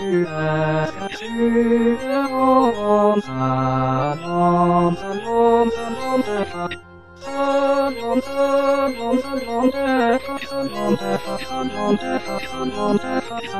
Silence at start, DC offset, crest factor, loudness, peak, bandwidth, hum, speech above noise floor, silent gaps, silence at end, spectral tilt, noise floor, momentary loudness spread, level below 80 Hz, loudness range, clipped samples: 0 s; 1%; 14 dB; -20 LUFS; -4 dBFS; 14 kHz; none; 21 dB; none; 0 s; -6.5 dB/octave; -40 dBFS; 9 LU; -48 dBFS; 3 LU; under 0.1%